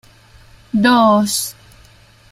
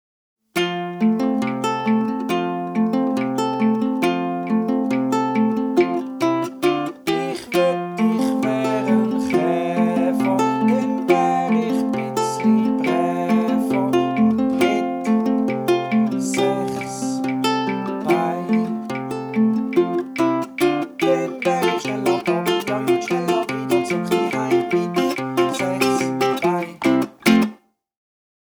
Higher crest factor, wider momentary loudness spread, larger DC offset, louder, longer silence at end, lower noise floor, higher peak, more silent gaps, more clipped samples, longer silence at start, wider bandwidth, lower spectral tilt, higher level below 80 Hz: about the same, 16 dB vs 18 dB; first, 11 LU vs 4 LU; neither; first, -15 LUFS vs -20 LUFS; second, 0.8 s vs 1.05 s; first, -47 dBFS vs -42 dBFS; about the same, -2 dBFS vs -2 dBFS; neither; neither; first, 0.75 s vs 0.55 s; second, 16 kHz vs over 20 kHz; second, -4 dB/octave vs -5.5 dB/octave; first, -50 dBFS vs -60 dBFS